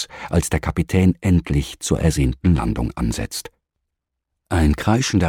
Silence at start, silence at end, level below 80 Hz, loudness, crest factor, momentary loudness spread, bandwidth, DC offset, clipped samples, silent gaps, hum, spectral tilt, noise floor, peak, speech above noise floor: 0 s; 0 s; -28 dBFS; -20 LUFS; 16 dB; 7 LU; 16.5 kHz; under 0.1%; under 0.1%; none; none; -6 dB/octave; -79 dBFS; -4 dBFS; 60 dB